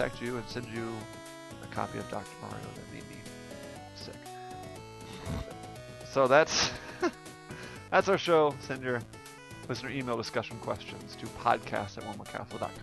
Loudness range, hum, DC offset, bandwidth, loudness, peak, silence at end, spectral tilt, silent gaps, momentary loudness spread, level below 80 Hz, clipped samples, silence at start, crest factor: 15 LU; none; under 0.1%; 12 kHz; -32 LUFS; -10 dBFS; 0 s; -4 dB/octave; none; 19 LU; -56 dBFS; under 0.1%; 0 s; 24 dB